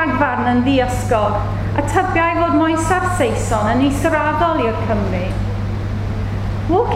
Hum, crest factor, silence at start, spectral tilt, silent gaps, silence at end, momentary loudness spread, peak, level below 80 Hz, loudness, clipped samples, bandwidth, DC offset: none; 14 dB; 0 s; -6.5 dB/octave; none; 0 s; 7 LU; -2 dBFS; -28 dBFS; -17 LUFS; under 0.1%; 14.5 kHz; under 0.1%